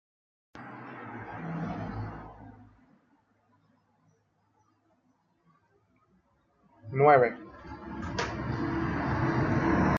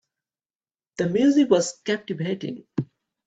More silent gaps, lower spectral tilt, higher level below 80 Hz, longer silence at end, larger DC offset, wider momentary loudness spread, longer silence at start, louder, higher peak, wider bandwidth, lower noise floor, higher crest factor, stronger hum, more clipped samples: neither; first, -7.5 dB/octave vs -5.5 dB/octave; first, -50 dBFS vs -66 dBFS; second, 0 s vs 0.45 s; neither; first, 23 LU vs 13 LU; second, 0.55 s vs 1 s; second, -29 LUFS vs -23 LUFS; about the same, -8 dBFS vs -6 dBFS; second, 7.4 kHz vs 8.4 kHz; second, -71 dBFS vs under -90 dBFS; about the same, 24 dB vs 20 dB; neither; neither